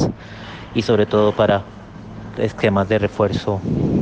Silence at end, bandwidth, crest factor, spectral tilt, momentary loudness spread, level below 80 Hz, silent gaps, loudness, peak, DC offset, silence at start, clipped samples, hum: 0 s; 8.6 kHz; 16 dB; -7 dB/octave; 19 LU; -42 dBFS; none; -19 LUFS; -4 dBFS; under 0.1%; 0 s; under 0.1%; none